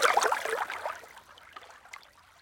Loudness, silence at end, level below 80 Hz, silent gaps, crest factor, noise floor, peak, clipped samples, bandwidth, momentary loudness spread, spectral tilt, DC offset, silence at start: -30 LUFS; 0.4 s; -72 dBFS; none; 24 dB; -52 dBFS; -10 dBFS; under 0.1%; 17 kHz; 23 LU; 0.5 dB/octave; under 0.1%; 0 s